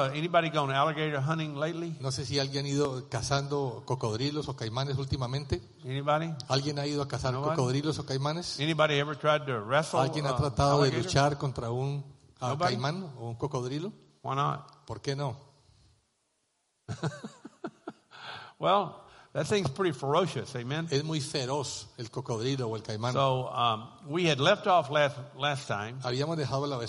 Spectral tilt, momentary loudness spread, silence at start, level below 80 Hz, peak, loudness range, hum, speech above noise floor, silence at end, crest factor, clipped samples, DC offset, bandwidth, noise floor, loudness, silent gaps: -5 dB/octave; 12 LU; 0 s; -56 dBFS; -10 dBFS; 8 LU; none; 46 dB; 0 s; 22 dB; under 0.1%; under 0.1%; 11.5 kHz; -76 dBFS; -30 LUFS; none